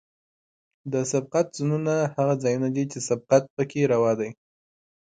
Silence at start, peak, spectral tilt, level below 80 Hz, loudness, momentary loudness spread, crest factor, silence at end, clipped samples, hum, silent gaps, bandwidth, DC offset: 0.85 s; -6 dBFS; -6 dB/octave; -68 dBFS; -25 LUFS; 7 LU; 20 dB; 0.8 s; under 0.1%; none; 3.50-3.57 s; 9.4 kHz; under 0.1%